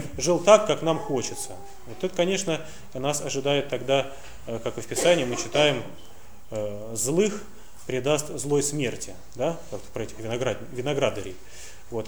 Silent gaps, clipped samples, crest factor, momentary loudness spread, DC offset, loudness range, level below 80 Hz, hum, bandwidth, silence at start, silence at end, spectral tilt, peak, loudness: none; under 0.1%; 24 dB; 16 LU; 1%; 4 LU; -52 dBFS; none; over 20 kHz; 0 s; 0 s; -4 dB/octave; -2 dBFS; -26 LUFS